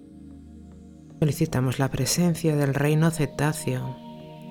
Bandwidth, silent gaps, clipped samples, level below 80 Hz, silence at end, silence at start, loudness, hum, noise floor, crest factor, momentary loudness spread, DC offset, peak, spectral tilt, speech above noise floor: 18.5 kHz; none; under 0.1%; -48 dBFS; 0 s; 0 s; -24 LUFS; none; -45 dBFS; 18 dB; 21 LU; under 0.1%; -8 dBFS; -5.5 dB/octave; 22 dB